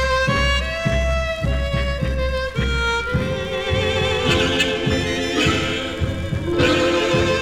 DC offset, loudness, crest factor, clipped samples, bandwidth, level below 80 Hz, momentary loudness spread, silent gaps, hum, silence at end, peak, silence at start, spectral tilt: under 0.1%; -20 LUFS; 16 dB; under 0.1%; 14.5 kHz; -28 dBFS; 5 LU; none; none; 0 s; -4 dBFS; 0 s; -5 dB/octave